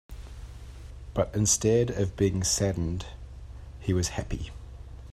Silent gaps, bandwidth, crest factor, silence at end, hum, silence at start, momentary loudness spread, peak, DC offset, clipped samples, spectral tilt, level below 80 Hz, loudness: none; 14 kHz; 18 dB; 0 s; none; 0.1 s; 22 LU; -10 dBFS; under 0.1%; under 0.1%; -4.5 dB/octave; -42 dBFS; -27 LUFS